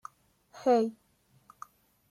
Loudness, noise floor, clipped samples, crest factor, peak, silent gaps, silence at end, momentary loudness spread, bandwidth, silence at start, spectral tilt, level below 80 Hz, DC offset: -29 LUFS; -62 dBFS; under 0.1%; 18 dB; -16 dBFS; none; 1.2 s; 25 LU; 13 kHz; 0.55 s; -5.5 dB/octave; -78 dBFS; under 0.1%